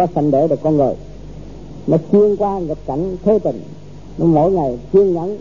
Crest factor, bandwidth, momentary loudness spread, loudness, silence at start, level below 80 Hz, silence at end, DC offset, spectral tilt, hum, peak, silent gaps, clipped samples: 14 dB; 7.2 kHz; 22 LU; -16 LUFS; 0 s; -40 dBFS; 0 s; 1%; -10.5 dB/octave; none; -2 dBFS; none; under 0.1%